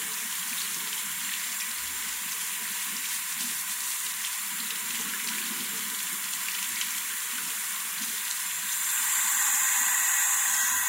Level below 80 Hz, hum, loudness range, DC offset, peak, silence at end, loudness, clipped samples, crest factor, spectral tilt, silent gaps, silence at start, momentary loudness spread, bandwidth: -76 dBFS; none; 5 LU; under 0.1%; -10 dBFS; 0 s; -27 LUFS; under 0.1%; 18 dB; 2.5 dB/octave; none; 0 s; 7 LU; 16 kHz